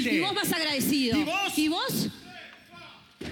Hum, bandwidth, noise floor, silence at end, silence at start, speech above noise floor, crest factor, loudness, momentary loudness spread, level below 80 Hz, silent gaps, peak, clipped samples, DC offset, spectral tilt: none; 19 kHz; -49 dBFS; 0 s; 0 s; 23 dB; 16 dB; -26 LUFS; 21 LU; -62 dBFS; none; -14 dBFS; under 0.1%; under 0.1%; -3.5 dB/octave